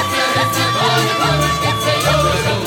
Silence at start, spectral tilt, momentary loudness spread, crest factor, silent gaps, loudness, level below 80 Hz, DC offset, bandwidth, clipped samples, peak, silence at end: 0 s; -4 dB/octave; 2 LU; 14 dB; none; -15 LUFS; -34 dBFS; under 0.1%; 17.5 kHz; under 0.1%; -2 dBFS; 0 s